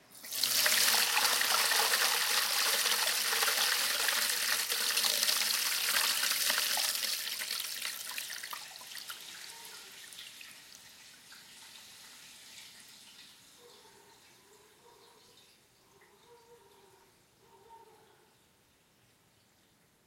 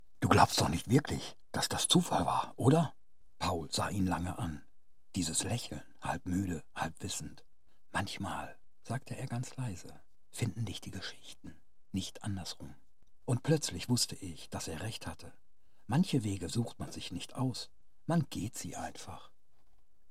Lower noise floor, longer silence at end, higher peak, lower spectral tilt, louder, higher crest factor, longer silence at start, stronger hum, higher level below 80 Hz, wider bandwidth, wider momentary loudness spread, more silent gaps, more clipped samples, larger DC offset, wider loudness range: about the same, -68 dBFS vs -69 dBFS; first, 2.3 s vs 0.85 s; about the same, -10 dBFS vs -10 dBFS; second, 2.5 dB/octave vs -4.5 dB/octave; first, -28 LUFS vs -35 LUFS; about the same, 24 dB vs 26 dB; about the same, 0.1 s vs 0.2 s; neither; second, -84 dBFS vs -60 dBFS; about the same, 17 kHz vs 16 kHz; first, 24 LU vs 18 LU; neither; neither; second, under 0.1% vs 0.4%; first, 24 LU vs 10 LU